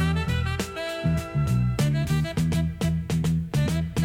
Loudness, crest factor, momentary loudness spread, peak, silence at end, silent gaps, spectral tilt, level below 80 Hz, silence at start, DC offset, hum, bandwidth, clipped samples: -25 LUFS; 12 dB; 4 LU; -12 dBFS; 0 s; none; -6.5 dB/octave; -36 dBFS; 0 s; under 0.1%; none; 16 kHz; under 0.1%